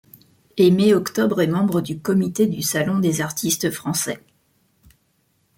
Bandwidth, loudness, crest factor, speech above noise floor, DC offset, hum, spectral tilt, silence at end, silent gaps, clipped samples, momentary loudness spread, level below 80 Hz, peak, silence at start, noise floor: 17 kHz; -20 LUFS; 16 dB; 46 dB; under 0.1%; none; -5 dB/octave; 1.4 s; none; under 0.1%; 7 LU; -58 dBFS; -4 dBFS; 0.55 s; -65 dBFS